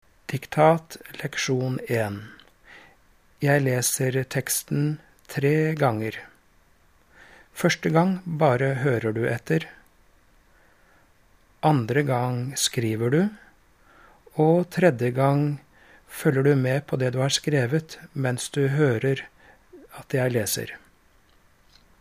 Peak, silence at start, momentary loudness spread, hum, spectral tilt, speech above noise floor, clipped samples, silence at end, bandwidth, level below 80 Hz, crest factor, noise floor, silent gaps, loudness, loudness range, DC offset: -4 dBFS; 0.3 s; 13 LU; none; -5.5 dB/octave; 37 dB; under 0.1%; 1.25 s; 15.5 kHz; -62 dBFS; 20 dB; -60 dBFS; none; -24 LUFS; 4 LU; under 0.1%